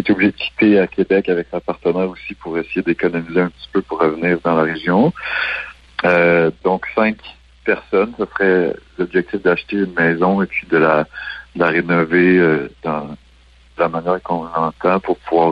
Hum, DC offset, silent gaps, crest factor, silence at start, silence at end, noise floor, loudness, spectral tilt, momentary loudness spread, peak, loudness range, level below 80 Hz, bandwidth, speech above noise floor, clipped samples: none; under 0.1%; none; 16 dB; 0 s; 0 s; -48 dBFS; -17 LUFS; -8.5 dB/octave; 10 LU; -2 dBFS; 3 LU; -48 dBFS; 5.8 kHz; 31 dB; under 0.1%